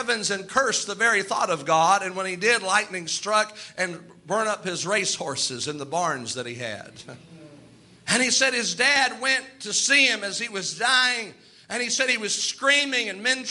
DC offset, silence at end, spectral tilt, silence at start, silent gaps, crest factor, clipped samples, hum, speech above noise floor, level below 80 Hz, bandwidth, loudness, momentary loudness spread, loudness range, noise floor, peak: under 0.1%; 0 s; -1 dB/octave; 0 s; none; 20 dB; under 0.1%; none; 27 dB; -70 dBFS; 11.5 kHz; -22 LUFS; 11 LU; 6 LU; -51 dBFS; -6 dBFS